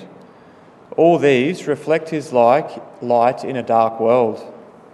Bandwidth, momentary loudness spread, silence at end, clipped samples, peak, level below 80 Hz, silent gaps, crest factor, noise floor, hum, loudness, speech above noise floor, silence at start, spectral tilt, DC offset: 12 kHz; 12 LU; 0.35 s; under 0.1%; 0 dBFS; -68 dBFS; none; 16 dB; -45 dBFS; none; -17 LUFS; 29 dB; 0 s; -6.5 dB/octave; under 0.1%